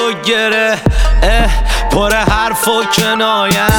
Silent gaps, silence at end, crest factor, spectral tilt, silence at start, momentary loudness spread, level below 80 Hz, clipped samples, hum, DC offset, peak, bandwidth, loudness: none; 0 s; 10 dB; -4 dB/octave; 0 s; 2 LU; -16 dBFS; under 0.1%; none; under 0.1%; 0 dBFS; 19 kHz; -12 LUFS